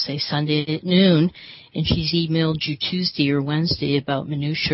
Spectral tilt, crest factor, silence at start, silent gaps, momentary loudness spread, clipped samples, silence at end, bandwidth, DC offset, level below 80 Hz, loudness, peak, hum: -8.5 dB/octave; 16 dB; 0 s; none; 8 LU; under 0.1%; 0 s; 6 kHz; under 0.1%; -46 dBFS; -21 LUFS; -4 dBFS; none